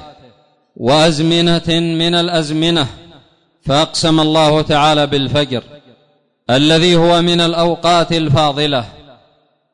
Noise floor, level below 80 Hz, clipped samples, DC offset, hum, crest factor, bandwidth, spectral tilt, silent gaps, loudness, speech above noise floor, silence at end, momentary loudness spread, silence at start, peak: -57 dBFS; -40 dBFS; under 0.1%; under 0.1%; none; 10 dB; 11 kHz; -5 dB/octave; none; -13 LUFS; 44 dB; 0.8 s; 8 LU; 0 s; -4 dBFS